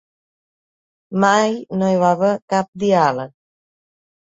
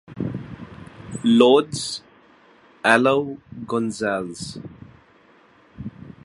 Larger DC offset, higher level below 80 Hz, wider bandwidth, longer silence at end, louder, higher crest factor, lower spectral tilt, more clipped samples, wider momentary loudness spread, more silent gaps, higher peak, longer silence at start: neither; second, -62 dBFS vs -56 dBFS; second, 7.8 kHz vs 11.5 kHz; first, 1.05 s vs 0.15 s; first, -17 LUFS vs -20 LUFS; about the same, 18 dB vs 22 dB; about the same, -5.5 dB/octave vs -5 dB/octave; neither; second, 10 LU vs 22 LU; first, 2.42-2.48 s, 2.68-2.73 s vs none; about the same, -2 dBFS vs 0 dBFS; first, 1.1 s vs 0.1 s